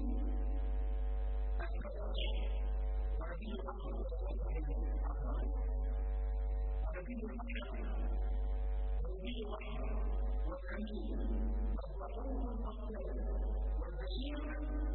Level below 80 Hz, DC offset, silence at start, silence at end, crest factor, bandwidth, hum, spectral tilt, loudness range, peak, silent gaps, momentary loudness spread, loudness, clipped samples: -38 dBFS; under 0.1%; 0 s; 0 s; 10 dB; 4.2 kHz; none; -6.5 dB/octave; 1 LU; -28 dBFS; none; 4 LU; -41 LUFS; under 0.1%